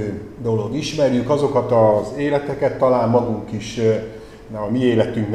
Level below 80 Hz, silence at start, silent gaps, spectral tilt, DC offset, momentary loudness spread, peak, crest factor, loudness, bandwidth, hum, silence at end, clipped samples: -46 dBFS; 0 s; none; -7 dB/octave; 0.2%; 12 LU; -2 dBFS; 16 dB; -19 LUFS; 12 kHz; none; 0 s; under 0.1%